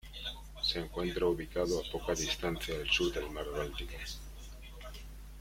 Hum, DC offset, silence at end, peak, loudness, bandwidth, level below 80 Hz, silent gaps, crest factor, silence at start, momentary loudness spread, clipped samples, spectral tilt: none; under 0.1%; 0 s; -16 dBFS; -35 LUFS; 16.5 kHz; -46 dBFS; none; 20 dB; 0.05 s; 18 LU; under 0.1%; -3.5 dB/octave